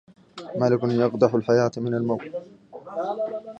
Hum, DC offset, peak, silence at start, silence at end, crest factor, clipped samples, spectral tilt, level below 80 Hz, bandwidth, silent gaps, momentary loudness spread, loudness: none; under 0.1%; -4 dBFS; 0.35 s; 0 s; 20 dB; under 0.1%; -7.5 dB/octave; -64 dBFS; 8 kHz; none; 20 LU; -23 LUFS